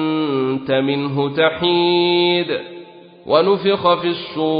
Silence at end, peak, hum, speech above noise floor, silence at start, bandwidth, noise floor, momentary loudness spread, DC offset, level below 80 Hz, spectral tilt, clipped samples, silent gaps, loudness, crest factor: 0 s; 0 dBFS; none; 23 dB; 0 s; 5.2 kHz; -39 dBFS; 7 LU; under 0.1%; -58 dBFS; -11 dB/octave; under 0.1%; none; -17 LUFS; 16 dB